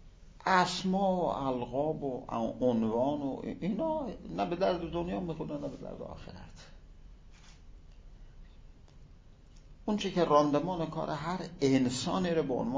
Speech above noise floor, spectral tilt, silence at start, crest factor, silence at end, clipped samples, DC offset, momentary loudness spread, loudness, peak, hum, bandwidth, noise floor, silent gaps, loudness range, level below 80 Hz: 23 dB; -6 dB/octave; 0 s; 22 dB; 0 s; under 0.1%; under 0.1%; 14 LU; -32 LUFS; -12 dBFS; none; 8 kHz; -55 dBFS; none; 14 LU; -54 dBFS